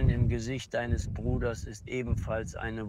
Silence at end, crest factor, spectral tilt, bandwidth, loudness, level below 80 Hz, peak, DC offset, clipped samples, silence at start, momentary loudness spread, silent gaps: 0 s; 16 dB; -6.5 dB/octave; 12 kHz; -32 LUFS; -36 dBFS; -14 dBFS; under 0.1%; under 0.1%; 0 s; 7 LU; none